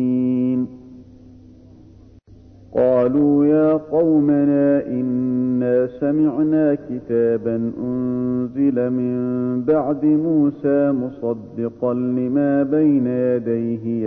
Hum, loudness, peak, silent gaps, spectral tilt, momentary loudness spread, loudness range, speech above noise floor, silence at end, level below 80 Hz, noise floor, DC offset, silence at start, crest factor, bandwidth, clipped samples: none; -19 LUFS; -6 dBFS; none; -12 dB/octave; 7 LU; 3 LU; 27 dB; 0 s; -54 dBFS; -45 dBFS; under 0.1%; 0 s; 12 dB; 3 kHz; under 0.1%